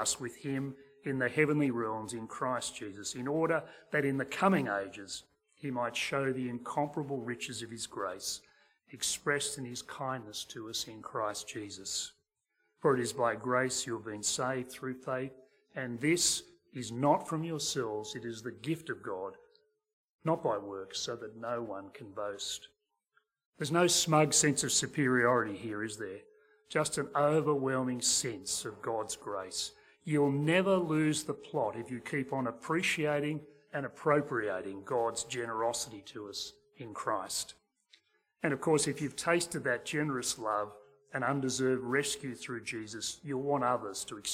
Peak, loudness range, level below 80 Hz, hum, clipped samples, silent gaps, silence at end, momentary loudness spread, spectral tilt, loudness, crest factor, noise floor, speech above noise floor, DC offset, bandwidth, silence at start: -12 dBFS; 8 LU; -70 dBFS; none; under 0.1%; 19.93-20.19 s, 23.45-23.52 s; 0 s; 13 LU; -3.5 dB/octave; -33 LUFS; 22 dB; -80 dBFS; 46 dB; under 0.1%; 16.5 kHz; 0 s